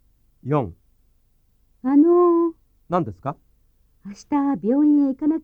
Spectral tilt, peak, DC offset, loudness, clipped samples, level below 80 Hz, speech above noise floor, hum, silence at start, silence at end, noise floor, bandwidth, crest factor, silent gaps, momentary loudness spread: -9.5 dB/octave; -6 dBFS; under 0.1%; -20 LUFS; under 0.1%; -56 dBFS; 40 dB; none; 0.45 s; 0.05 s; -61 dBFS; 6.8 kHz; 16 dB; none; 20 LU